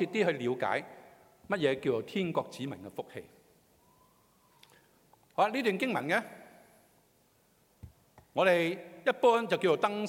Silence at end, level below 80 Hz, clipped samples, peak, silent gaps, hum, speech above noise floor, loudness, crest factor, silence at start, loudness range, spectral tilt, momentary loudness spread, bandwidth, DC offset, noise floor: 0 s; -72 dBFS; under 0.1%; -12 dBFS; none; none; 38 dB; -31 LUFS; 20 dB; 0 s; 7 LU; -5.5 dB/octave; 16 LU; 16.5 kHz; under 0.1%; -68 dBFS